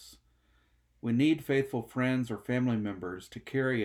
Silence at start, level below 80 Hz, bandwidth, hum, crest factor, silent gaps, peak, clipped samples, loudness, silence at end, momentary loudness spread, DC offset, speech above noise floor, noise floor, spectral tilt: 0 s; -64 dBFS; 15.5 kHz; none; 16 dB; none; -16 dBFS; under 0.1%; -31 LUFS; 0 s; 12 LU; under 0.1%; 38 dB; -68 dBFS; -7 dB/octave